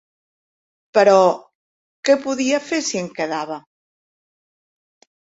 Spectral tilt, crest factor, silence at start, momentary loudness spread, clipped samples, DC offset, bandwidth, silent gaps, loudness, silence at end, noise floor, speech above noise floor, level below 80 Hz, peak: -3.5 dB/octave; 20 dB; 0.95 s; 14 LU; under 0.1%; under 0.1%; 8 kHz; 1.55-2.03 s; -18 LUFS; 1.7 s; under -90 dBFS; over 73 dB; -68 dBFS; -2 dBFS